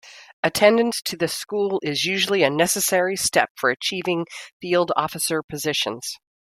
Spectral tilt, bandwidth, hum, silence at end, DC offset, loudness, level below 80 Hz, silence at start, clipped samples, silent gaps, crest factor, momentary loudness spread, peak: -3 dB/octave; 16 kHz; none; 0.35 s; under 0.1%; -21 LUFS; -62 dBFS; 0.05 s; under 0.1%; 0.33-0.43 s, 3.50-3.55 s, 4.52-4.60 s, 5.44-5.48 s; 20 dB; 8 LU; -2 dBFS